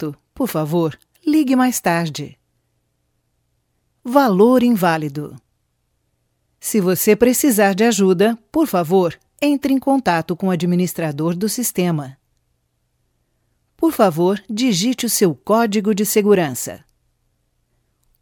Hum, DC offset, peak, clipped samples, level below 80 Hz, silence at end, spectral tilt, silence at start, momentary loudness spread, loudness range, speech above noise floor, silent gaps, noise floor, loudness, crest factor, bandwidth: none; under 0.1%; 0 dBFS; under 0.1%; -56 dBFS; 1.45 s; -5 dB/octave; 0 s; 12 LU; 5 LU; 52 dB; none; -68 dBFS; -17 LUFS; 18 dB; 17.5 kHz